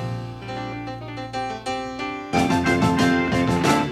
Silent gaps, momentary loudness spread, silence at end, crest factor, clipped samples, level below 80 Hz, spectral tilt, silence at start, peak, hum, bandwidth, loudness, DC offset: none; 13 LU; 0 s; 16 dB; under 0.1%; -46 dBFS; -5.5 dB/octave; 0 s; -6 dBFS; none; 15 kHz; -23 LUFS; under 0.1%